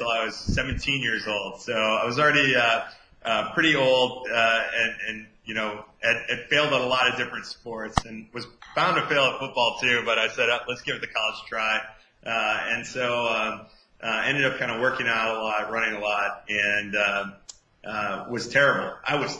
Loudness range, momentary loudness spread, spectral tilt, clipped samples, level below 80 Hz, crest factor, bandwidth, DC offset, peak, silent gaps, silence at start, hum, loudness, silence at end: 4 LU; 12 LU; -3.5 dB/octave; under 0.1%; -48 dBFS; 22 dB; 10 kHz; under 0.1%; -4 dBFS; none; 0 s; none; -24 LUFS; 0 s